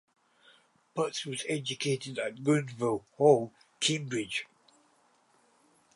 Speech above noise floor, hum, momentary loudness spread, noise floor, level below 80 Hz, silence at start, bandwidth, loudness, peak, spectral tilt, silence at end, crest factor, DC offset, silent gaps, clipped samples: 38 dB; none; 12 LU; -67 dBFS; -76 dBFS; 0.95 s; 11.5 kHz; -30 LUFS; -10 dBFS; -4.5 dB/octave; 1.5 s; 22 dB; under 0.1%; none; under 0.1%